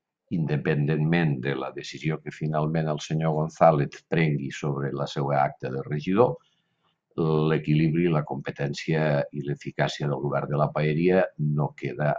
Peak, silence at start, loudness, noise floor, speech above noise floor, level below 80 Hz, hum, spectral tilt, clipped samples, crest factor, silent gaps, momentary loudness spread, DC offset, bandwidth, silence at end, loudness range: -4 dBFS; 0.3 s; -26 LUFS; -72 dBFS; 48 dB; -58 dBFS; none; -7.5 dB/octave; under 0.1%; 20 dB; none; 9 LU; under 0.1%; 7.6 kHz; 0 s; 2 LU